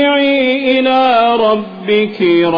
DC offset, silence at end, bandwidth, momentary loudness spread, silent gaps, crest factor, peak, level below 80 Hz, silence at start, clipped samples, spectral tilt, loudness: under 0.1%; 0 s; 5.2 kHz; 4 LU; none; 10 dB; -2 dBFS; -54 dBFS; 0 s; under 0.1%; -7 dB/octave; -12 LUFS